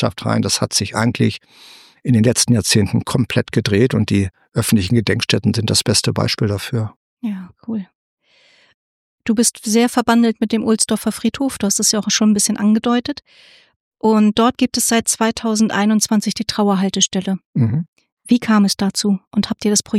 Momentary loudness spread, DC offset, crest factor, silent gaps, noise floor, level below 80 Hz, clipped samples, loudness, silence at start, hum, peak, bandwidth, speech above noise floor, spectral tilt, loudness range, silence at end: 9 LU; under 0.1%; 16 dB; 6.96-7.17 s, 7.95-8.18 s, 8.74-9.18 s, 13.76-13.91 s, 17.45-17.53 s, 17.88-17.93 s, 18.12-18.17 s, 19.27-19.31 s; -54 dBFS; -50 dBFS; under 0.1%; -16 LUFS; 0 s; none; -2 dBFS; 15.5 kHz; 37 dB; -4.5 dB/octave; 4 LU; 0 s